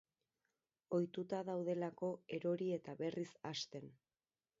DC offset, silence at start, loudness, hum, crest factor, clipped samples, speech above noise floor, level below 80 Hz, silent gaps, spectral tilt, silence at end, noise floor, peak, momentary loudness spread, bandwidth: under 0.1%; 0.9 s; -43 LUFS; none; 18 dB; under 0.1%; over 48 dB; -86 dBFS; none; -5.5 dB/octave; 0.65 s; under -90 dBFS; -28 dBFS; 6 LU; 7.6 kHz